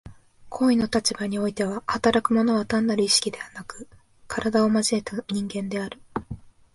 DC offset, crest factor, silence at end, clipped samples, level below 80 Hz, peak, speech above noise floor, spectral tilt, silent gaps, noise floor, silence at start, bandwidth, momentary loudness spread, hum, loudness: under 0.1%; 20 dB; 0.25 s; under 0.1%; -54 dBFS; -4 dBFS; 20 dB; -4 dB/octave; none; -44 dBFS; 0.05 s; 11.5 kHz; 17 LU; none; -24 LUFS